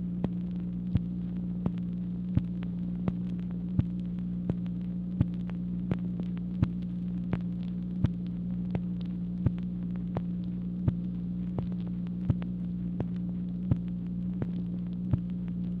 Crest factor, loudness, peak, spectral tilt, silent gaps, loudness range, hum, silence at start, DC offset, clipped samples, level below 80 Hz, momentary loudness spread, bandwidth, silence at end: 22 dB; -33 LUFS; -10 dBFS; -11 dB/octave; none; 1 LU; 60 Hz at -50 dBFS; 0 s; under 0.1%; under 0.1%; -46 dBFS; 3 LU; 4.2 kHz; 0 s